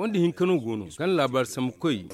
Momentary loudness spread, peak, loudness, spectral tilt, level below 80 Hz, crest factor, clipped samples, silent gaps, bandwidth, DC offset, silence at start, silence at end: 6 LU; -12 dBFS; -26 LUFS; -6 dB/octave; -64 dBFS; 14 dB; under 0.1%; none; 15 kHz; under 0.1%; 0 s; 0 s